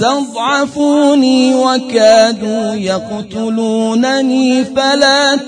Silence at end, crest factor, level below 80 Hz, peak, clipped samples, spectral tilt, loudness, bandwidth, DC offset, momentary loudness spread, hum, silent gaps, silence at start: 0 s; 12 dB; -54 dBFS; 0 dBFS; 0.1%; -3.5 dB/octave; -11 LUFS; 10 kHz; under 0.1%; 9 LU; none; none; 0 s